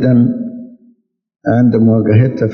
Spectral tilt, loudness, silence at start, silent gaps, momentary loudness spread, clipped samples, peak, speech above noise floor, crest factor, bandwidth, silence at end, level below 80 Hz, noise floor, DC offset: -11 dB/octave; -12 LUFS; 0 s; none; 14 LU; under 0.1%; 0 dBFS; 42 dB; 12 dB; 5 kHz; 0 s; -52 dBFS; -53 dBFS; under 0.1%